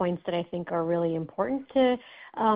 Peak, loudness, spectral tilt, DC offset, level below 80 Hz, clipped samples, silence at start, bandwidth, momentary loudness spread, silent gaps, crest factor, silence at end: -10 dBFS; -28 LUFS; -5.5 dB/octave; under 0.1%; -64 dBFS; under 0.1%; 0 s; 4.9 kHz; 7 LU; none; 16 dB; 0 s